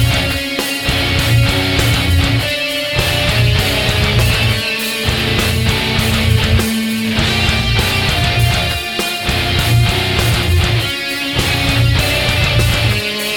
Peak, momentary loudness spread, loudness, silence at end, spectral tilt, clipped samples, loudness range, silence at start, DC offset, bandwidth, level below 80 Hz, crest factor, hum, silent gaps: 0 dBFS; 4 LU; -14 LUFS; 0 s; -4 dB/octave; under 0.1%; 1 LU; 0 s; 0.1%; over 20 kHz; -24 dBFS; 14 dB; none; none